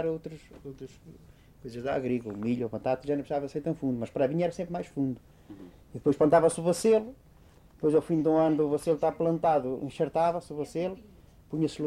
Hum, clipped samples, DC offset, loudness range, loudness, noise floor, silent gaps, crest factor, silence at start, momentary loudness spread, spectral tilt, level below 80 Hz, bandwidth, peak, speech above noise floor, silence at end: none; under 0.1%; under 0.1%; 7 LU; -28 LUFS; -56 dBFS; none; 18 dB; 0 s; 20 LU; -7 dB/octave; -58 dBFS; 14 kHz; -10 dBFS; 28 dB; 0 s